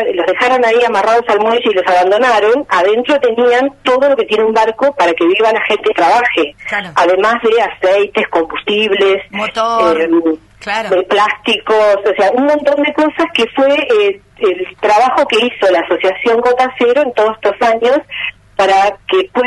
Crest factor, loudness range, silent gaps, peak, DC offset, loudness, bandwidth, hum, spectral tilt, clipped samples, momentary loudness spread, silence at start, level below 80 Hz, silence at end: 10 dB; 2 LU; none; 0 dBFS; under 0.1%; -12 LUFS; 11.5 kHz; none; -3.5 dB/octave; under 0.1%; 5 LU; 0 s; -50 dBFS; 0 s